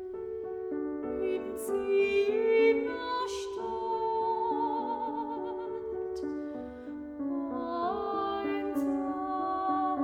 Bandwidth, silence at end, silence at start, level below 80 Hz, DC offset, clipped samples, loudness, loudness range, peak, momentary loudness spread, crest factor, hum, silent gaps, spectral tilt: 16.5 kHz; 0 s; 0 s; -62 dBFS; under 0.1%; under 0.1%; -32 LUFS; 6 LU; -14 dBFS; 11 LU; 16 dB; none; none; -5 dB/octave